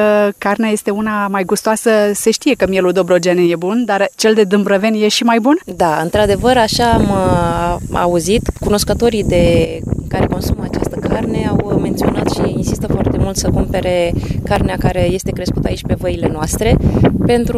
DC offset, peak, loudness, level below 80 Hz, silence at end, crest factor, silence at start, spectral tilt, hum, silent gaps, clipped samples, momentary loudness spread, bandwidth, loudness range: under 0.1%; 0 dBFS; -14 LUFS; -26 dBFS; 0 s; 12 dB; 0 s; -5.5 dB/octave; none; none; under 0.1%; 6 LU; 16 kHz; 4 LU